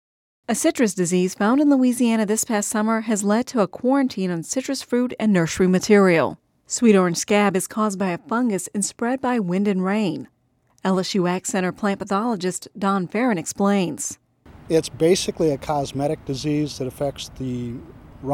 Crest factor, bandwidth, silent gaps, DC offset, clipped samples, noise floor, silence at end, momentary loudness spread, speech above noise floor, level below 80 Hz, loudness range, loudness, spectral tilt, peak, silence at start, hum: 16 dB; 16.5 kHz; none; under 0.1%; under 0.1%; -62 dBFS; 0 s; 10 LU; 42 dB; -54 dBFS; 4 LU; -21 LUFS; -5 dB/octave; -4 dBFS; 0.5 s; none